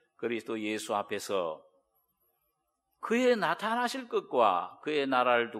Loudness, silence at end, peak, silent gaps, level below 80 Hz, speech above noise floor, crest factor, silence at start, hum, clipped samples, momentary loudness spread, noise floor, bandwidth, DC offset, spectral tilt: -30 LUFS; 0 s; -12 dBFS; none; -84 dBFS; 50 dB; 20 dB; 0.2 s; none; under 0.1%; 9 LU; -80 dBFS; 15 kHz; under 0.1%; -4 dB/octave